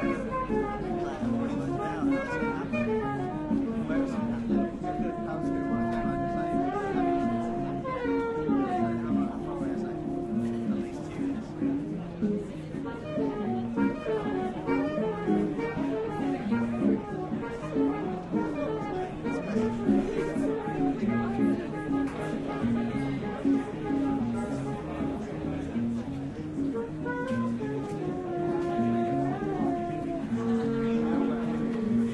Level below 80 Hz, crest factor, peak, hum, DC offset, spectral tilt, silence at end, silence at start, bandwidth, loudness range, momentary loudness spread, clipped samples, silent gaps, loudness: -50 dBFS; 16 dB; -14 dBFS; none; under 0.1%; -8 dB/octave; 0 s; 0 s; 11 kHz; 3 LU; 5 LU; under 0.1%; none; -30 LUFS